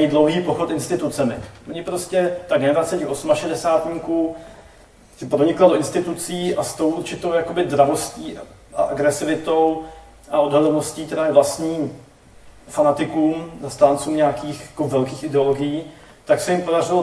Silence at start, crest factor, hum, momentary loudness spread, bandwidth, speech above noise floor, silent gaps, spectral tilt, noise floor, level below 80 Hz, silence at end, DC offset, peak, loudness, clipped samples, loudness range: 0 s; 20 dB; none; 13 LU; 11 kHz; 28 dB; none; -5.5 dB/octave; -48 dBFS; -52 dBFS; 0 s; under 0.1%; 0 dBFS; -20 LUFS; under 0.1%; 2 LU